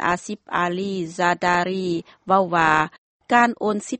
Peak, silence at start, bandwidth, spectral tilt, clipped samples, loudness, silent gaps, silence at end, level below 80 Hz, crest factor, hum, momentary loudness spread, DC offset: -2 dBFS; 0 s; 8.8 kHz; -5 dB/octave; under 0.1%; -21 LUFS; 2.98-3.20 s; 0 s; -56 dBFS; 20 dB; none; 9 LU; under 0.1%